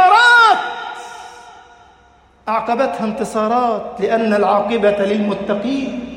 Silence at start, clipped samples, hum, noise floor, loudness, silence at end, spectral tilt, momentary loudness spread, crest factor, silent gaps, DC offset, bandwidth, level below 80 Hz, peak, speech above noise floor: 0 s; under 0.1%; none; -50 dBFS; -15 LUFS; 0 s; -4.5 dB/octave; 20 LU; 16 dB; none; under 0.1%; 16 kHz; -54 dBFS; 0 dBFS; 33 dB